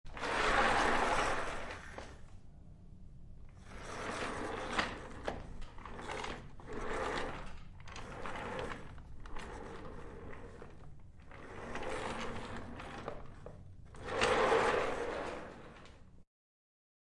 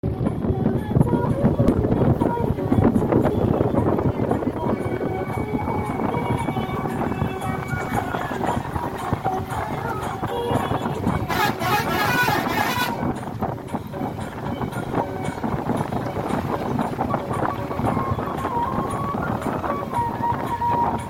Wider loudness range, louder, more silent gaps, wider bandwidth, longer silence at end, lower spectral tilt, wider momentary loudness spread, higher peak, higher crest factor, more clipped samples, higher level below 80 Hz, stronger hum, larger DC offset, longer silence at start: first, 11 LU vs 6 LU; second, -37 LUFS vs -23 LUFS; neither; second, 11.5 kHz vs 17 kHz; first, 0.85 s vs 0 s; second, -4 dB/octave vs -7 dB/octave; first, 26 LU vs 8 LU; second, -18 dBFS vs -4 dBFS; about the same, 22 dB vs 20 dB; neither; second, -50 dBFS vs -38 dBFS; neither; neither; about the same, 0.05 s vs 0.05 s